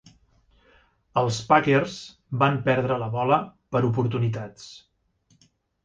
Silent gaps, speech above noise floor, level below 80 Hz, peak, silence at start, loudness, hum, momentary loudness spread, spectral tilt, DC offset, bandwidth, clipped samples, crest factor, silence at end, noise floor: none; 41 dB; -58 dBFS; -4 dBFS; 1.15 s; -24 LUFS; none; 15 LU; -6.5 dB/octave; under 0.1%; 9.2 kHz; under 0.1%; 22 dB; 1.05 s; -65 dBFS